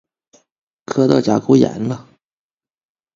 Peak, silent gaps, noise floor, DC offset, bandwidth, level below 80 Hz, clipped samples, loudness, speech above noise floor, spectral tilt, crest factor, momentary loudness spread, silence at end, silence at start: 0 dBFS; none; -57 dBFS; under 0.1%; 7.6 kHz; -56 dBFS; under 0.1%; -16 LUFS; 42 dB; -7 dB/octave; 18 dB; 11 LU; 1.15 s; 0.9 s